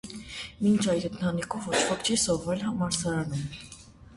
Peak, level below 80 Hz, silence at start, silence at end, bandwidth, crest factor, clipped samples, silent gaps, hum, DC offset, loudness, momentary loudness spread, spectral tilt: -10 dBFS; -54 dBFS; 0.05 s; 0 s; 11.5 kHz; 18 dB; under 0.1%; none; none; under 0.1%; -28 LUFS; 14 LU; -4 dB/octave